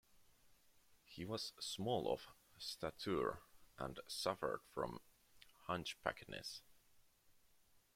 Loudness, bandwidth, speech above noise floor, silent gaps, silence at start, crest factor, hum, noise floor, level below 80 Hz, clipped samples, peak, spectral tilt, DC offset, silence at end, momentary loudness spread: -45 LUFS; 16.5 kHz; 28 dB; none; 0.15 s; 26 dB; none; -72 dBFS; -72 dBFS; under 0.1%; -22 dBFS; -4 dB/octave; under 0.1%; 0.65 s; 14 LU